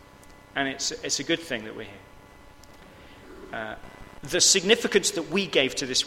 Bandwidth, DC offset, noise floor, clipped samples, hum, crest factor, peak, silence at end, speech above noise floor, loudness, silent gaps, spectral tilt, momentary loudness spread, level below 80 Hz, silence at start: 16.5 kHz; under 0.1%; -50 dBFS; under 0.1%; none; 26 dB; -2 dBFS; 0 s; 24 dB; -24 LUFS; none; -1.5 dB/octave; 22 LU; -54 dBFS; 0.2 s